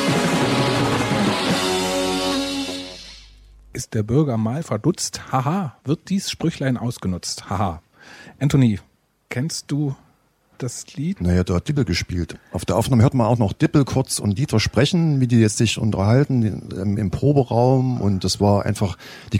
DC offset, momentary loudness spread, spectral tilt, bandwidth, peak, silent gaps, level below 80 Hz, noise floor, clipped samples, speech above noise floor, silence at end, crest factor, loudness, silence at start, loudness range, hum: under 0.1%; 11 LU; -5.5 dB/octave; 16 kHz; -4 dBFS; none; -44 dBFS; -59 dBFS; under 0.1%; 40 dB; 0 s; 16 dB; -20 LUFS; 0 s; 6 LU; none